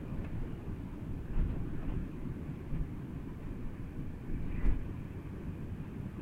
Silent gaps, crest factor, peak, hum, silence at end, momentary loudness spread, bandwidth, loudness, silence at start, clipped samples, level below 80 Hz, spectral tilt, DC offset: none; 20 dB; -18 dBFS; none; 0 s; 6 LU; 4.1 kHz; -41 LUFS; 0 s; under 0.1%; -40 dBFS; -9 dB/octave; under 0.1%